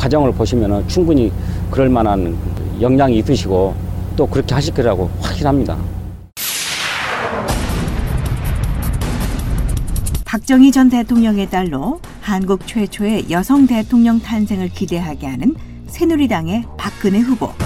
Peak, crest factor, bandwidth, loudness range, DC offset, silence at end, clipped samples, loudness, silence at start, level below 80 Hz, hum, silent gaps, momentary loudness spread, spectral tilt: 0 dBFS; 16 dB; 16 kHz; 5 LU; under 0.1%; 0 s; under 0.1%; -16 LUFS; 0 s; -26 dBFS; none; none; 9 LU; -6 dB/octave